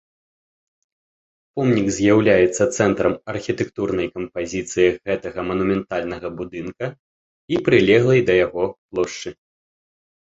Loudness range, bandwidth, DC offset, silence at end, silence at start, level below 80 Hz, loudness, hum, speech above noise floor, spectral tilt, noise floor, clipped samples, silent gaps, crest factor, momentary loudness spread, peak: 4 LU; 8.2 kHz; under 0.1%; 0.9 s; 1.55 s; -50 dBFS; -20 LUFS; none; over 71 dB; -5.5 dB/octave; under -90 dBFS; under 0.1%; 6.99-7.48 s, 8.78-8.89 s; 20 dB; 15 LU; -2 dBFS